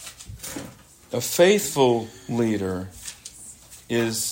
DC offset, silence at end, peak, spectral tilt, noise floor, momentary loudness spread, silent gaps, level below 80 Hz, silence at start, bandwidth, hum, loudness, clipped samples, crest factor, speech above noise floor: under 0.1%; 0 s; -4 dBFS; -4 dB/octave; -45 dBFS; 22 LU; none; -56 dBFS; 0 s; 16.5 kHz; none; -23 LUFS; under 0.1%; 20 dB; 23 dB